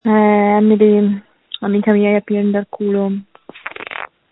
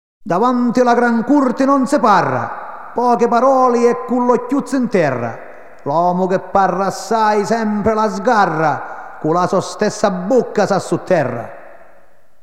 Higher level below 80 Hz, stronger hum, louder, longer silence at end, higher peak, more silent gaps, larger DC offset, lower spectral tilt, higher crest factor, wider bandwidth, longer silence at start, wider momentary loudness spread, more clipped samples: about the same, -58 dBFS vs -54 dBFS; neither; about the same, -14 LUFS vs -15 LUFS; second, 0.25 s vs 0.7 s; about the same, 0 dBFS vs -2 dBFS; neither; second, under 0.1% vs 1%; first, -11.5 dB/octave vs -6 dB/octave; about the same, 14 dB vs 14 dB; second, 4 kHz vs 13 kHz; second, 0.05 s vs 0.25 s; first, 17 LU vs 10 LU; neither